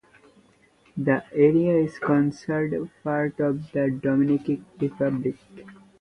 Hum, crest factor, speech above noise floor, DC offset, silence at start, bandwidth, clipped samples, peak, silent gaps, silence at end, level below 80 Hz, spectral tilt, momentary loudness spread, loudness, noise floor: none; 18 dB; 36 dB; under 0.1%; 0.95 s; 8.8 kHz; under 0.1%; -6 dBFS; none; 0.25 s; -62 dBFS; -9 dB/octave; 10 LU; -24 LUFS; -59 dBFS